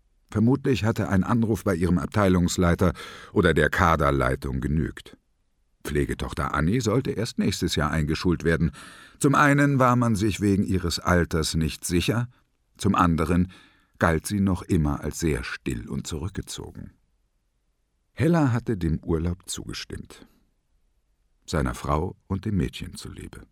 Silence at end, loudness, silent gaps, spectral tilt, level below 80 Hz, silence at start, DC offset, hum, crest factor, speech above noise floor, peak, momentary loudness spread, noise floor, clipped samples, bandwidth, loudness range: 0.05 s; -24 LUFS; none; -6 dB/octave; -40 dBFS; 0.3 s; under 0.1%; none; 22 dB; 47 dB; -4 dBFS; 13 LU; -71 dBFS; under 0.1%; 16.5 kHz; 9 LU